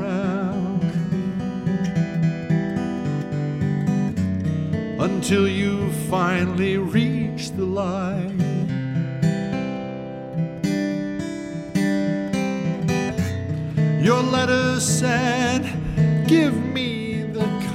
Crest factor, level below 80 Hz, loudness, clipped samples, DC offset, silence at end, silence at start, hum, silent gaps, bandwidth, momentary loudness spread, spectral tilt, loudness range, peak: 16 dB; -48 dBFS; -22 LUFS; under 0.1%; under 0.1%; 0 s; 0 s; none; none; 14.5 kHz; 7 LU; -6 dB/octave; 5 LU; -4 dBFS